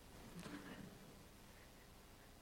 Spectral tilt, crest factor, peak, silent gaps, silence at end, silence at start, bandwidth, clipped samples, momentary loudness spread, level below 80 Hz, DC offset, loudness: -4.5 dB/octave; 20 dB; -38 dBFS; none; 0 s; 0 s; 16.5 kHz; under 0.1%; 9 LU; -68 dBFS; under 0.1%; -58 LUFS